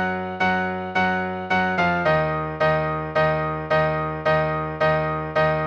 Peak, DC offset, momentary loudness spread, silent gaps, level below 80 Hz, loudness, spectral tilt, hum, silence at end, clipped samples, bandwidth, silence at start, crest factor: -8 dBFS; under 0.1%; 4 LU; none; -44 dBFS; -22 LUFS; -7 dB/octave; none; 0 s; under 0.1%; 7.4 kHz; 0 s; 14 dB